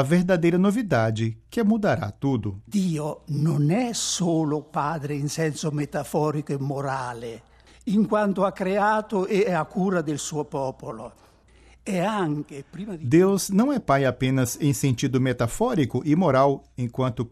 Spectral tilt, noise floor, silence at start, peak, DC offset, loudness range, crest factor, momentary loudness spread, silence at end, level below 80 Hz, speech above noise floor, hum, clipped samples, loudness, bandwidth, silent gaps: -6 dB/octave; -54 dBFS; 0 s; -6 dBFS; under 0.1%; 5 LU; 18 dB; 10 LU; 0.05 s; -52 dBFS; 30 dB; none; under 0.1%; -24 LUFS; 14 kHz; none